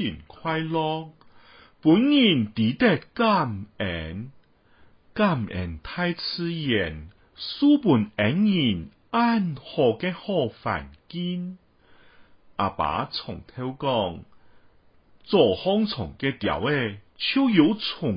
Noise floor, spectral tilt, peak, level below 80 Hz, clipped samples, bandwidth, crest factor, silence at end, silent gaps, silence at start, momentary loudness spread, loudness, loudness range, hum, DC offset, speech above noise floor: -56 dBFS; -10.5 dB/octave; -6 dBFS; -50 dBFS; under 0.1%; 5.4 kHz; 20 dB; 0 s; none; 0 s; 14 LU; -24 LUFS; 7 LU; none; under 0.1%; 32 dB